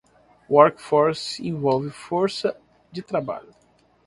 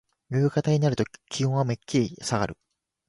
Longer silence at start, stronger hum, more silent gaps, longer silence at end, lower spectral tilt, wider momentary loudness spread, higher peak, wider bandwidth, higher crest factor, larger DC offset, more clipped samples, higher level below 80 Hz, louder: first, 0.5 s vs 0.3 s; neither; neither; about the same, 0.65 s vs 0.55 s; about the same, -6 dB/octave vs -6 dB/octave; first, 16 LU vs 7 LU; first, 0 dBFS vs -10 dBFS; about the same, 11.5 kHz vs 11.5 kHz; first, 22 dB vs 16 dB; neither; neither; second, -62 dBFS vs -56 dBFS; first, -22 LUFS vs -26 LUFS